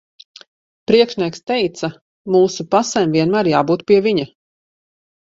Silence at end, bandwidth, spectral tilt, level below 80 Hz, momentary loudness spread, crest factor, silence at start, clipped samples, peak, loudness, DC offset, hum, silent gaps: 1.15 s; 7.8 kHz; -5 dB/octave; -58 dBFS; 12 LU; 18 dB; 0.9 s; under 0.1%; 0 dBFS; -16 LUFS; under 0.1%; none; 2.01-2.25 s